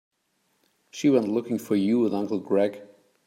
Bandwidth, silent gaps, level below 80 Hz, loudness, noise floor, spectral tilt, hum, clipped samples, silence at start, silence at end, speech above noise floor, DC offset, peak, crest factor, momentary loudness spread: 16 kHz; none; -74 dBFS; -25 LUFS; -72 dBFS; -6.5 dB/octave; none; under 0.1%; 0.95 s; 0.4 s; 48 dB; under 0.1%; -8 dBFS; 18 dB; 6 LU